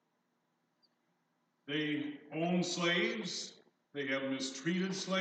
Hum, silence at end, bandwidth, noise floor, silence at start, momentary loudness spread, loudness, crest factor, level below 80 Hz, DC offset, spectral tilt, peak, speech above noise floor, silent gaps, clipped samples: 60 Hz at -55 dBFS; 0 s; 9.2 kHz; -80 dBFS; 1.65 s; 10 LU; -36 LUFS; 18 dB; under -90 dBFS; under 0.1%; -4 dB/octave; -20 dBFS; 44 dB; none; under 0.1%